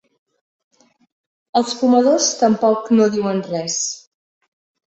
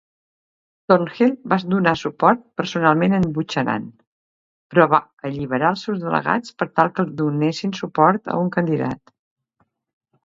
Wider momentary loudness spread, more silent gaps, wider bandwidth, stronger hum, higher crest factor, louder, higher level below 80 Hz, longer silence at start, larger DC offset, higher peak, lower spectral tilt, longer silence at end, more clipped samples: about the same, 8 LU vs 8 LU; second, none vs 4.07-4.70 s, 5.13-5.17 s; about the same, 8.2 kHz vs 7.6 kHz; neither; about the same, 16 dB vs 20 dB; first, -17 LUFS vs -20 LUFS; second, -64 dBFS vs -58 dBFS; first, 1.55 s vs 0.9 s; neither; about the same, -2 dBFS vs 0 dBFS; second, -4 dB/octave vs -7 dB/octave; second, 0.9 s vs 1.3 s; neither